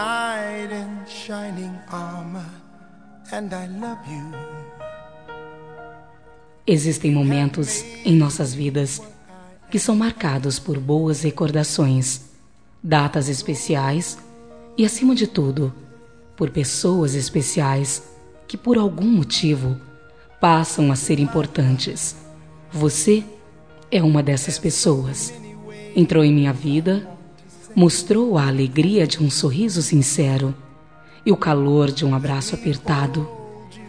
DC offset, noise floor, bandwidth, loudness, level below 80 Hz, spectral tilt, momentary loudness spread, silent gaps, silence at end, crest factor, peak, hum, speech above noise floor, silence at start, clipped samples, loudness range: 0.3%; -53 dBFS; 10.5 kHz; -20 LUFS; -52 dBFS; -5.5 dB/octave; 17 LU; none; 0 s; 20 dB; -2 dBFS; none; 34 dB; 0 s; under 0.1%; 13 LU